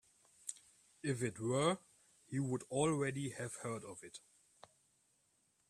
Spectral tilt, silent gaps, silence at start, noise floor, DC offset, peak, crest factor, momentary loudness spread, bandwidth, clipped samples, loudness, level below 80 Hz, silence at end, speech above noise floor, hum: -5 dB/octave; none; 0.45 s; -78 dBFS; under 0.1%; -20 dBFS; 22 dB; 16 LU; 14 kHz; under 0.1%; -40 LUFS; -74 dBFS; 1.5 s; 39 dB; none